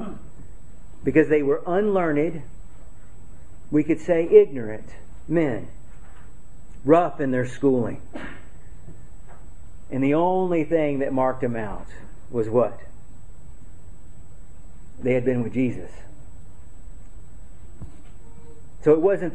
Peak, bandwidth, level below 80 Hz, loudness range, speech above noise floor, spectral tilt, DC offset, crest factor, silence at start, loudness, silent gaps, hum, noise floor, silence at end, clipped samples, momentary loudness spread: -2 dBFS; 9.8 kHz; -46 dBFS; 7 LU; 24 dB; -8.5 dB/octave; 3%; 22 dB; 0 s; -22 LUFS; none; none; -46 dBFS; 0 s; under 0.1%; 20 LU